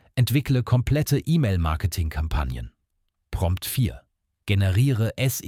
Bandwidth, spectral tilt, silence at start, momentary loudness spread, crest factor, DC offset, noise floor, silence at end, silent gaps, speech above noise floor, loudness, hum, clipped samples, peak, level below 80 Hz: 17 kHz; -6 dB/octave; 0.15 s; 9 LU; 14 dB; under 0.1%; -74 dBFS; 0 s; none; 52 dB; -24 LUFS; none; under 0.1%; -10 dBFS; -34 dBFS